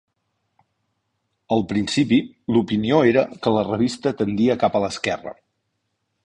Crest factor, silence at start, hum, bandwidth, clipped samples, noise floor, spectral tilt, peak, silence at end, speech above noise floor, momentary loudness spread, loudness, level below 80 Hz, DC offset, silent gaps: 18 dB; 1.5 s; none; 10.5 kHz; under 0.1%; -74 dBFS; -6 dB/octave; -4 dBFS; 0.9 s; 55 dB; 7 LU; -21 LUFS; -54 dBFS; under 0.1%; none